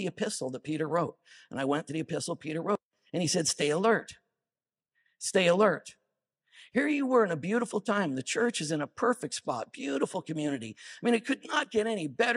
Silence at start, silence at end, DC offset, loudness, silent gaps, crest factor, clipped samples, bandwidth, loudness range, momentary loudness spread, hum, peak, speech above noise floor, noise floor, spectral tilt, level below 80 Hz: 0 s; 0 s; under 0.1%; -30 LUFS; 2.83-2.91 s; 20 dB; under 0.1%; 14.5 kHz; 3 LU; 9 LU; none; -10 dBFS; over 60 dB; under -90 dBFS; -4 dB/octave; -76 dBFS